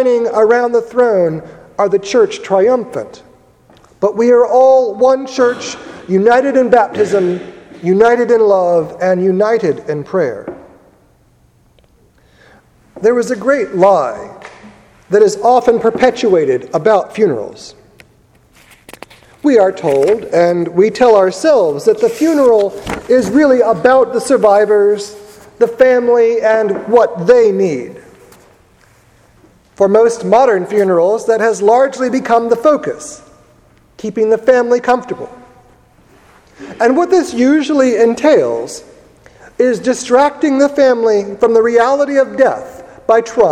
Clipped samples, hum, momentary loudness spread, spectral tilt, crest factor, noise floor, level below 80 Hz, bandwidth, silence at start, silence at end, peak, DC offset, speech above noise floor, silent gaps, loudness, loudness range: under 0.1%; none; 12 LU; -5.5 dB/octave; 12 dB; -50 dBFS; -52 dBFS; 12.5 kHz; 0 s; 0 s; 0 dBFS; under 0.1%; 39 dB; none; -12 LUFS; 5 LU